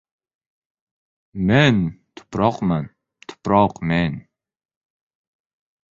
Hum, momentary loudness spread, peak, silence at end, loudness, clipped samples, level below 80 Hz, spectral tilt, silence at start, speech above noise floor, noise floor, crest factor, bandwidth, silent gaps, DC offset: none; 17 LU; -2 dBFS; 1.75 s; -19 LUFS; under 0.1%; -46 dBFS; -7 dB/octave; 1.35 s; 24 dB; -43 dBFS; 20 dB; 7.4 kHz; none; under 0.1%